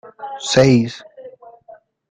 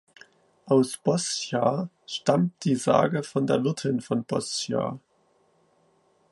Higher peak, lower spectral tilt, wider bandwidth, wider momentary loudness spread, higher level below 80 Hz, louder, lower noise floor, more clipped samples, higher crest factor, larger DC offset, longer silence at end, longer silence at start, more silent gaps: first, 0 dBFS vs -6 dBFS; about the same, -5.5 dB/octave vs -5.5 dB/octave; second, 9.6 kHz vs 11.5 kHz; first, 20 LU vs 7 LU; first, -50 dBFS vs -68 dBFS; first, -15 LUFS vs -26 LUFS; second, -46 dBFS vs -66 dBFS; neither; about the same, 18 dB vs 22 dB; neither; second, 0.8 s vs 1.35 s; second, 0.05 s vs 0.65 s; neither